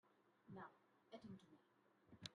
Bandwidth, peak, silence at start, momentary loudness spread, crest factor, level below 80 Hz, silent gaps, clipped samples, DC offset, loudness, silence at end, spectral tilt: 10 kHz; -34 dBFS; 0.05 s; 4 LU; 30 dB; under -90 dBFS; none; under 0.1%; under 0.1%; -62 LUFS; 0 s; -4.5 dB/octave